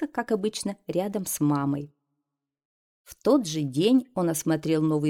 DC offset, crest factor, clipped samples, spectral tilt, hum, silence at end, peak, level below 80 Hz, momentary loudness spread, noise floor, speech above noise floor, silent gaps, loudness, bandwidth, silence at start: under 0.1%; 16 dB; under 0.1%; -5.5 dB/octave; none; 0 s; -10 dBFS; -64 dBFS; 7 LU; -84 dBFS; 59 dB; 2.65-3.05 s; -26 LUFS; 17 kHz; 0 s